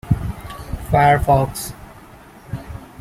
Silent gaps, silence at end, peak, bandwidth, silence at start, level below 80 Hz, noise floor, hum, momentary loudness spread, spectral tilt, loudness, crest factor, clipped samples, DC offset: none; 0 s; -2 dBFS; 16 kHz; 0.05 s; -34 dBFS; -42 dBFS; none; 19 LU; -6 dB/octave; -17 LUFS; 18 dB; under 0.1%; under 0.1%